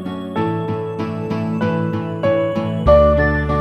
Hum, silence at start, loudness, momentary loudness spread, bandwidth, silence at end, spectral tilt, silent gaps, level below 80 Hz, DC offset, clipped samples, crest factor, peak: none; 0 s; -18 LUFS; 11 LU; 8.4 kHz; 0 s; -8.5 dB/octave; none; -28 dBFS; under 0.1%; under 0.1%; 16 dB; -2 dBFS